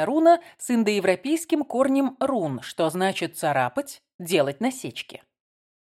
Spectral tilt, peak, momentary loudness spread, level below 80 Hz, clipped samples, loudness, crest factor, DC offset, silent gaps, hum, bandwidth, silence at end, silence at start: -5 dB/octave; -6 dBFS; 13 LU; -72 dBFS; under 0.1%; -24 LUFS; 18 dB; under 0.1%; 4.14-4.19 s; none; 16 kHz; 0.8 s; 0 s